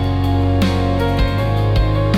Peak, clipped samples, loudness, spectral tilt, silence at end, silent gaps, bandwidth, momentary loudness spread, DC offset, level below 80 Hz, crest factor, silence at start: -6 dBFS; under 0.1%; -17 LUFS; -7.5 dB/octave; 0 s; none; 14 kHz; 1 LU; under 0.1%; -22 dBFS; 10 dB; 0 s